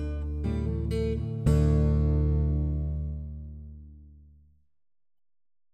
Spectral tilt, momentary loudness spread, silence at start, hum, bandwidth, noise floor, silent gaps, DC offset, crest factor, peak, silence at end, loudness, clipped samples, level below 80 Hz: -9 dB/octave; 19 LU; 0 s; none; 9 kHz; -62 dBFS; none; under 0.1%; 16 dB; -12 dBFS; 1.6 s; -28 LUFS; under 0.1%; -32 dBFS